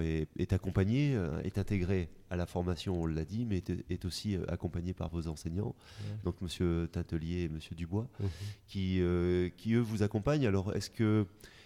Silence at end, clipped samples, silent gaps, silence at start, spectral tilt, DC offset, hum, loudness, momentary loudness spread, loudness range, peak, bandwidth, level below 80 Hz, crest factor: 0 s; under 0.1%; none; 0 s; -7 dB/octave; under 0.1%; none; -35 LUFS; 8 LU; 5 LU; -16 dBFS; 14.5 kHz; -50 dBFS; 18 dB